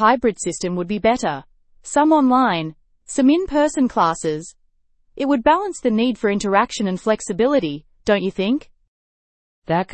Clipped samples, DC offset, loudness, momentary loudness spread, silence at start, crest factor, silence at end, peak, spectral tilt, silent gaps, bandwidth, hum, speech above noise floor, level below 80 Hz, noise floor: under 0.1%; under 0.1%; -19 LUFS; 10 LU; 0 s; 18 dB; 0 s; -2 dBFS; -5 dB/octave; 8.88-9.62 s; 8.8 kHz; none; 42 dB; -48 dBFS; -60 dBFS